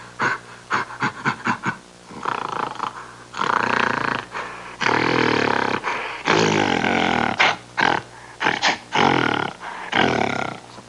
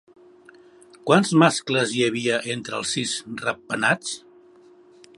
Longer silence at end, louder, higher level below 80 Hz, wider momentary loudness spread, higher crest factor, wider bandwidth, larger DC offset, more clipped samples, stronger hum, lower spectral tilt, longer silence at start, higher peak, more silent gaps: second, 0 s vs 1 s; about the same, -21 LUFS vs -22 LUFS; first, -58 dBFS vs -68 dBFS; about the same, 12 LU vs 10 LU; about the same, 20 dB vs 22 dB; about the same, 11.5 kHz vs 11.5 kHz; neither; neither; neither; about the same, -4 dB/octave vs -4 dB/octave; second, 0 s vs 1.05 s; about the same, -2 dBFS vs -2 dBFS; neither